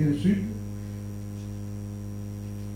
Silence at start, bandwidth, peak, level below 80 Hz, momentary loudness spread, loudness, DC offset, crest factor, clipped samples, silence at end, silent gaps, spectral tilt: 0 s; 16 kHz; -12 dBFS; -46 dBFS; 11 LU; -32 LUFS; under 0.1%; 18 dB; under 0.1%; 0 s; none; -8 dB/octave